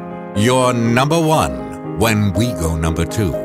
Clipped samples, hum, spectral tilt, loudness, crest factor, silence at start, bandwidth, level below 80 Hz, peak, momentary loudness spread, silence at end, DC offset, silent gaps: under 0.1%; none; -5.5 dB/octave; -16 LUFS; 14 dB; 0 s; 16 kHz; -32 dBFS; -2 dBFS; 7 LU; 0 s; under 0.1%; none